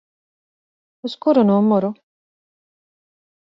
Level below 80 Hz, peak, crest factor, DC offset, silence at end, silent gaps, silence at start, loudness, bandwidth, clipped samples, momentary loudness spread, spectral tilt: -68 dBFS; -4 dBFS; 18 dB; under 0.1%; 1.65 s; none; 1.05 s; -17 LUFS; 6 kHz; under 0.1%; 16 LU; -9 dB/octave